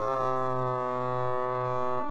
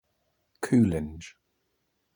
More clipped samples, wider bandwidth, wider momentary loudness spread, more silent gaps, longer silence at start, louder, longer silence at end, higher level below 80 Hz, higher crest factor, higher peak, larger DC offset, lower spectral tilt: neither; second, 8.8 kHz vs over 20 kHz; second, 2 LU vs 22 LU; neither; second, 0 s vs 0.6 s; second, -30 LUFS vs -25 LUFS; second, 0 s vs 0.85 s; second, -62 dBFS vs -52 dBFS; second, 12 dB vs 18 dB; second, -16 dBFS vs -12 dBFS; neither; about the same, -8 dB/octave vs -7.5 dB/octave